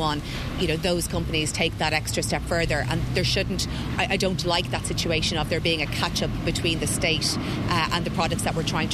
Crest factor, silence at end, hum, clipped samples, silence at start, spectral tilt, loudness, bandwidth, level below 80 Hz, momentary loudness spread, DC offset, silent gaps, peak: 18 dB; 0 s; none; under 0.1%; 0 s; -4 dB/octave; -24 LUFS; 14 kHz; -36 dBFS; 4 LU; under 0.1%; none; -8 dBFS